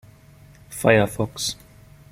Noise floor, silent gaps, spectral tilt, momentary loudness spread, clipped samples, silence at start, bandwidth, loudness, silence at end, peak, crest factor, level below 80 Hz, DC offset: -49 dBFS; none; -4.5 dB/octave; 19 LU; under 0.1%; 0.7 s; 16.5 kHz; -21 LUFS; 0.6 s; -2 dBFS; 22 dB; -50 dBFS; under 0.1%